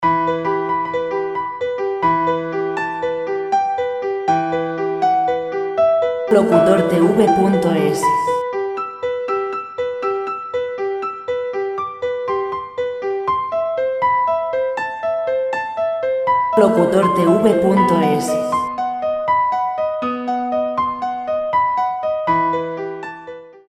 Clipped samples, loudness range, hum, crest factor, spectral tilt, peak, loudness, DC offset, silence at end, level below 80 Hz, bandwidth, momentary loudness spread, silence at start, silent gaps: under 0.1%; 7 LU; none; 18 dB; -6.5 dB/octave; 0 dBFS; -18 LUFS; under 0.1%; 0.1 s; -54 dBFS; 14.5 kHz; 9 LU; 0 s; none